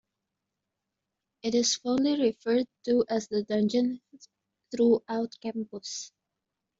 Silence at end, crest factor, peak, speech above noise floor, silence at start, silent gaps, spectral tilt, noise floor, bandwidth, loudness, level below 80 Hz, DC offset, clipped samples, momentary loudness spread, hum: 0.7 s; 16 dB; -12 dBFS; 58 dB; 1.45 s; none; -4 dB/octave; -86 dBFS; 7.8 kHz; -28 LUFS; -70 dBFS; under 0.1%; under 0.1%; 12 LU; none